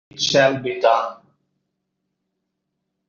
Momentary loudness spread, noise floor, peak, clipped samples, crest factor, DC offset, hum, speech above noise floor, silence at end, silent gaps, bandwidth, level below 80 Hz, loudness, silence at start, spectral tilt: 5 LU; -77 dBFS; -4 dBFS; under 0.1%; 20 dB; under 0.1%; none; 59 dB; 1.95 s; none; 7.6 kHz; -64 dBFS; -18 LUFS; 0.15 s; -2 dB/octave